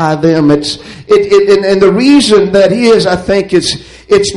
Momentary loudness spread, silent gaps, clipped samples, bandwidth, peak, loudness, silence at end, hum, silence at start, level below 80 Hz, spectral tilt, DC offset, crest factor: 7 LU; none; 0.3%; 11.5 kHz; 0 dBFS; -8 LUFS; 0 s; none; 0 s; -38 dBFS; -5 dB/octave; under 0.1%; 8 dB